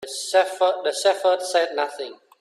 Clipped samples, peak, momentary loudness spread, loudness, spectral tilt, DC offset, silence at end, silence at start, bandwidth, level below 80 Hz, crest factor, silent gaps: under 0.1%; -6 dBFS; 9 LU; -21 LUFS; 0 dB/octave; under 0.1%; 0.25 s; 0 s; 13.5 kHz; -78 dBFS; 16 dB; none